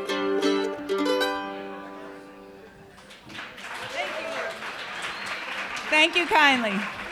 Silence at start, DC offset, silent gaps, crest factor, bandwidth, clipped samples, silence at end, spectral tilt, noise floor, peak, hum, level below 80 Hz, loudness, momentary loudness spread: 0 s; under 0.1%; none; 22 dB; 15.5 kHz; under 0.1%; 0 s; -3 dB/octave; -48 dBFS; -4 dBFS; none; -64 dBFS; -25 LUFS; 22 LU